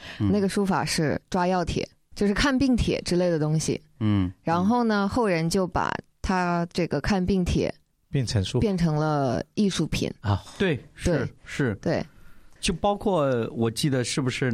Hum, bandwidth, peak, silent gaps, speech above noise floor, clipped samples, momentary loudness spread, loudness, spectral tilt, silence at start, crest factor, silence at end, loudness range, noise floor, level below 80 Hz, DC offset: none; 15 kHz; -10 dBFS; none; 22 dB; under 0.1%; 6 LU; -25 LUFS; -5.5 dB/octave; 0 s; 14 dB; 0 s; 3 LU; -47 dBFS; -42 dBFS; under 0.1%